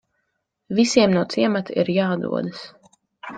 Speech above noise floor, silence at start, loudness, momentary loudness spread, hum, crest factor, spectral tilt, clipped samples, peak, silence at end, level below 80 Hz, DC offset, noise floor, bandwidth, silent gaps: 55 dB; 0.7 s; -20 LUFS; 19 LU; none; 20 dB; -5.5 dB/octave; under 0.1%; -2 dBFS; 0 s; -62 dBFS; under 0.1%; -75 dBFS; 9.4 kHz; none